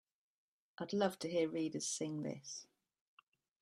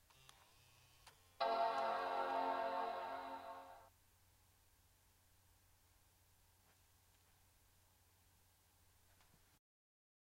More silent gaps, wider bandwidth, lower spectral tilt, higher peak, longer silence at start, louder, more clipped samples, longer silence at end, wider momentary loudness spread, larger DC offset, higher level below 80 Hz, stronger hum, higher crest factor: neither; second, 13.5 kHz vs 16 kHz; about the same, -4 dB/octave vs -3.5 dB/octave; first, -20 dBFS vs -28 dBFS; second, 0.8 s vs 1.05 s; about the same, -40 LUFS vs -42 LUFS; neither; second, 1 s vs 6.55 s; second, 12 LU vs 17 LU; neither; about the same, -84 dBFS vs -80 dBFS; neither; about the same, 22 dB vs 20 dB